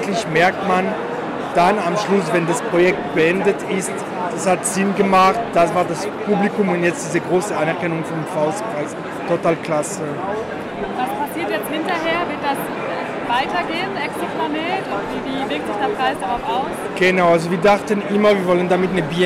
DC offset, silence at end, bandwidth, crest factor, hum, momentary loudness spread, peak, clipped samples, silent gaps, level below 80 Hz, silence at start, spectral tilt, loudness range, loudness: under 0.1%; 0 s; 16 kHz; 12 dB; none; 9 LU; -6 dBFS; under 0.1%; none; -52 dBFS; 0 s; -5 dB/octave; 5 LU; -19 LUFS